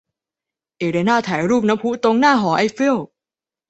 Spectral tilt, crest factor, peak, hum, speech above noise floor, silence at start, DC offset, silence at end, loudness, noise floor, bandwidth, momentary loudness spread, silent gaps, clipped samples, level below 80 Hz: -5.5 dB/octave; 16 dB; -2 dBFS; none; 73 dB; 0.8 s; under 0.1%; 0.65 s; -17 LUFS; -90 dBFS; 8.2 kHz; 9 LU; none; under 0.1%; -60 dBFS